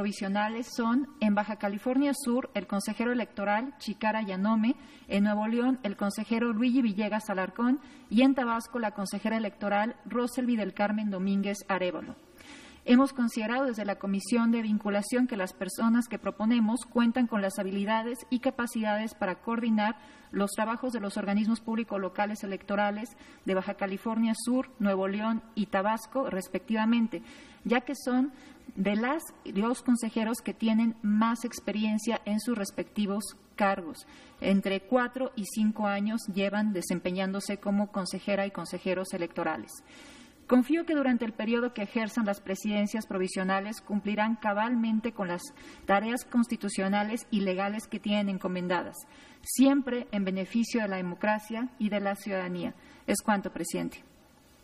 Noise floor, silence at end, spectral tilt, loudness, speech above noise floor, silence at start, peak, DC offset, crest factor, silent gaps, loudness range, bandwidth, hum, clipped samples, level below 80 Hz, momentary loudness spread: -59 dBFS; 0.65 s; -5.5 dB/octave; -30 LUFS; 29 dB; 0 s; -12 dBFS; under 0.1%; 18 dB; none; 3 LU; 15 kHz; none; under 0.1%; -66 dBFS; 8 LU